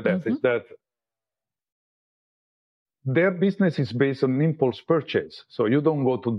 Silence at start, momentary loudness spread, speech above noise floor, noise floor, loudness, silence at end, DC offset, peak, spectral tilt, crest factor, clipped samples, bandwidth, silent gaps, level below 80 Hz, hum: 0 s; 7 LU; over 67 dB; under -90 dBFS; -23 LUFS; 0 s; under 0.1%; -8 dBFS; -9 dB/octave; 18 dB; under 0.1%; 6.2 kHz; 1.72-2.86 s; -72 dBFS; none